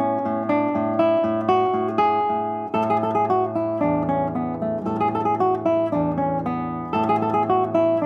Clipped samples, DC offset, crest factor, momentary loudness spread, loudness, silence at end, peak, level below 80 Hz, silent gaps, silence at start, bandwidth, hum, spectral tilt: under 0.1%; under 0.1%; 14 dB; 5 LU; -22 LUFS; 0 s; -6 dBFS; -54 dBFS; none; 0 s; 6.8 kHz; none; -9 dB/octave